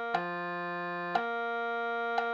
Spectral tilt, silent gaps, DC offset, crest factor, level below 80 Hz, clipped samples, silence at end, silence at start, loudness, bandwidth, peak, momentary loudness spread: -6 dB/octave; none; under 0.1%; 20 dB; -80 dBFS; under 0.1%; 0 s; 0 s; -33 LUFS; 7.6 kHz; -14 dBFS; 3 LU